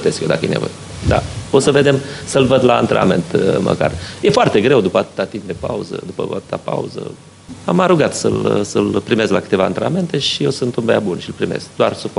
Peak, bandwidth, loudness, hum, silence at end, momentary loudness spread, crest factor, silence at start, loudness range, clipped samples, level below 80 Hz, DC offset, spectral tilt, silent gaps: 0 dBFS; 11.5 kHz; -16 LUFS; none; 0 s; 11 LU; 16 dB; 0 s; 5 LU; under 0.1%; -40 dBFS; under 0.1%; -5.5 dB/octave; none